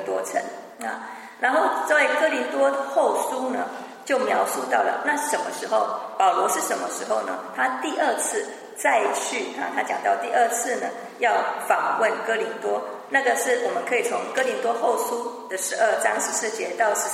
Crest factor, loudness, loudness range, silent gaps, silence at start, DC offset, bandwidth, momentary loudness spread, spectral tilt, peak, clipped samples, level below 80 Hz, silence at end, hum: 20 dB; -23 LUFS; 1 LU; none; 0 s; under 0.1%; 16 kHz; 9 LU; -1.5 dB/octave; -4 dBFS; under 0.1%; -86 dBFS; 0 s; none